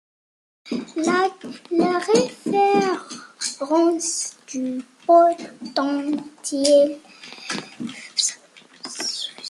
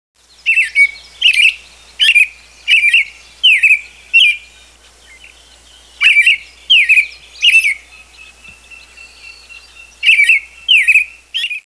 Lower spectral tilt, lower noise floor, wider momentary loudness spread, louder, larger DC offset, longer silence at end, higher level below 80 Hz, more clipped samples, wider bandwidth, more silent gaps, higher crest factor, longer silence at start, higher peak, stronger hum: first, -3 dB/octave vs 3.5 dB/octave; first, -49 dBFS vs -44 dBFS; first, 17 LU vs 12 LU; second, -21 LUFS vs -9 LUFS; second, under 0.1% vs 0.1%; about the same, 0 s vs 0.1 s; second, -70 dBFS vs -52 dBFS; neither; first, 12.5 kHz vs 11 kHz; neither; about the same, 18 dB vs 14 dB; first, 0.65 s vs 0.45 s; second, -4 dBFS vs 0 dBFS; neither